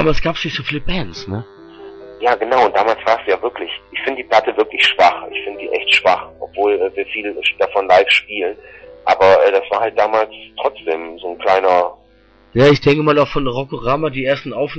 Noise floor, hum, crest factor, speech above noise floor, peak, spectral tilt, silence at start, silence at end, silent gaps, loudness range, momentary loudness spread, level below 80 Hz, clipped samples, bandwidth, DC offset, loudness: -50 dBFS; none; 14 dB; 34 dB; -2 dBFS; -5.5 dB/octave; 0 s; 0 s; none; 4 LU; 13 LU; -36 dBFS; under 0.1%; 8.4 kHz; under 0.1%; -16 LUFS